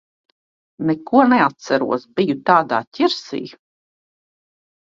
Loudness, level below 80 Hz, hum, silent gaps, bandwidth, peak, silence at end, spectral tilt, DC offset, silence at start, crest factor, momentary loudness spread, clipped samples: -18 LUFS; -62 dBFS; none; 2.87-2.91 s; 7.6 kHz; 0 dBFS; 1.35 s; -6 dB/octave; under 0.1%; 0.8 s; 20 dB; 11 LU; under 0.1%